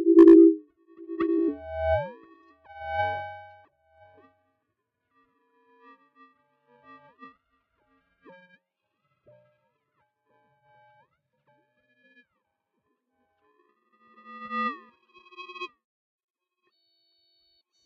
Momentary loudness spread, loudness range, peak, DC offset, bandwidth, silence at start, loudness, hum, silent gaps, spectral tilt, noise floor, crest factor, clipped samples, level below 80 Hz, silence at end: 30 LU; 16 LU; -6 dBFS; under 0.1%; 4.7 kHz; 0 s; -22 LUFS; none; none; -8.5 dB/octave; -80 dBFS; 22 dB; under 0.1%; -58 dBFS; 2.2 s